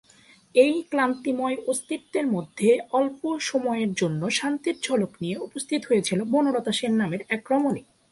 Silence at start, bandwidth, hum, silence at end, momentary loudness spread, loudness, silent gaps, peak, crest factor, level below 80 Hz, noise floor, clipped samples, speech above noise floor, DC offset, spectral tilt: 0.55 s; 11.5 kHz; none; 0.3 s; 8 LU; -25 LUFS; none; -6 dBFS; 20 dB; -68 dBFS; -55 dBFS; under 0.1%; 31 dB; under 0.1%; -4.5 dB/octave